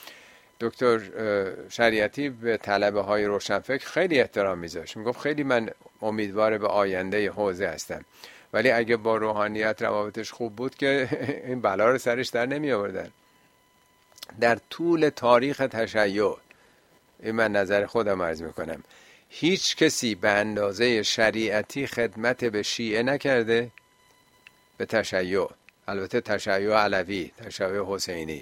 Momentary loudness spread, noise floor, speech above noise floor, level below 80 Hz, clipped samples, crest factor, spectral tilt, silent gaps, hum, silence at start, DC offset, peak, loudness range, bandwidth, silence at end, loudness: 11 LU; -62 dBFS; 37 dB; -62 dBFS; under 0.1%; 22 dB; -4 dB/octave; none; none; 0 s; under 0.1%; -4 dBFS; 3 LU; 16.5 kHz; 0 s; -25 LUFS